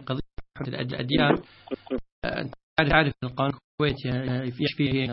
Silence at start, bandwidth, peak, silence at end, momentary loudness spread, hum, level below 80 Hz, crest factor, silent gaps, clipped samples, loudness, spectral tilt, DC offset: 0 s; 5.8 kHz; -4 dBFS; 0 s; 13 LU; none; -44 dBFS; 24 dB; 2.12-2.22 s, 2.63-2.76 s, 3.64-3.78 s; under 0.1%; -27 LUFS; -10.5 dB/octave; under 0.1%